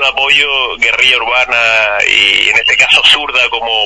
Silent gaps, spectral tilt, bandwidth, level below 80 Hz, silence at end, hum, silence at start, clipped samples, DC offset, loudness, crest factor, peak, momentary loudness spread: none; 0 dB/octave; 11 kHz; -42 dBFS; 0 s; none; 0 s; 0.8%; under 0.1%; -7 LUFS; 10 dB; 0 dBFS; 5 LU